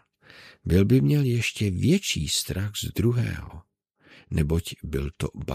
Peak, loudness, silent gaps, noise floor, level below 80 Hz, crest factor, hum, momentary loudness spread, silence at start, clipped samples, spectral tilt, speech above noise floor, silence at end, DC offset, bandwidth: -8 dBFS; -25 LUFS; none; -56 dBFS; -40 dBFS; 18 dB; none; 12 LU; 0.4 s; under 0.1%; -5.5 dB/octave; 32 dB; 0 s; under 0.1%; 15.5 kHz